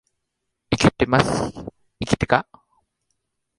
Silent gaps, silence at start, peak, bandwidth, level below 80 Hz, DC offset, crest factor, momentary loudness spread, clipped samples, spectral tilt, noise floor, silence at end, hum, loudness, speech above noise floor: none; 0.7 s; -2 dBFS; 11.5 kHz; -42 dBFS; under 0.1%; 22 dB; 15 LU; under 0.1%; -5.5 dB/octave; -78 dBFS; 1.15 s; none; -21 LUFS; 57 dB